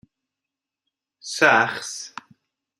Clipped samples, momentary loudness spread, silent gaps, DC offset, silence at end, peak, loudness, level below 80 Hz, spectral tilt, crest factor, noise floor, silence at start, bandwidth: under 0.1%; 23 LU; none; under 0.1%; 0.7 s; -2 dBFS; -20 LUFS; -74 dBFS; -2.5 dB/octave; 24 dB; -86 dBFS; 1.25 s; 14 kHz